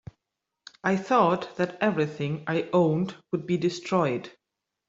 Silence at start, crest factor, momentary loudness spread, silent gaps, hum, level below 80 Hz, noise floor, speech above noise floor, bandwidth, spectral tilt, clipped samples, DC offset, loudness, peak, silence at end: 0.85 s; 20 dB; 9 LU; none; none; -66 dBFS; -85 dBFS; 59 dB; 7.8 kHz; -7 dB/octave; under 0.1%; under 0.1%; -26 LUFS; -8 dBFS; 0.6 s